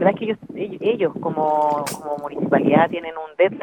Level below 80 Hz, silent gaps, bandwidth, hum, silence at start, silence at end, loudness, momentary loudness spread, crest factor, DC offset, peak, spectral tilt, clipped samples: -64 dBFS; none; 17 kHz; none; 0 s; 0 s; -21 LUFS; 11 LU; 18 dB; under 0.1%; -2 dBFS; -6 dB/octave; under 0.1%